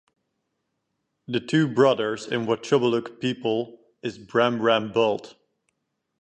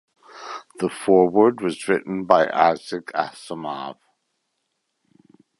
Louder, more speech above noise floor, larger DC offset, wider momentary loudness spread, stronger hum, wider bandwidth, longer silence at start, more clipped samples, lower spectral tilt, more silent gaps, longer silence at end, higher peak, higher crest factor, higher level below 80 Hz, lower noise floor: second, -24 LUFS vs -21 LUFS; about the same, 54 dB vs 55 dB; neither; second, 12 LU vs 19 LU; neither; second, 9.2 kHz vs 11.5 kHz; first, 1.3 s vs 0.35 s; neither; about the same, -6 dB/octave vs -5.5 dB/octave; neither; second, 0.9 s vs 1.65 s; second, -6 dBFS vs 0 dBFS; about the same, 20 dB vs 22 dB; second, -70 dBFS vs -64 dBFS; about the same, -78 dBFS vs -75 dBFS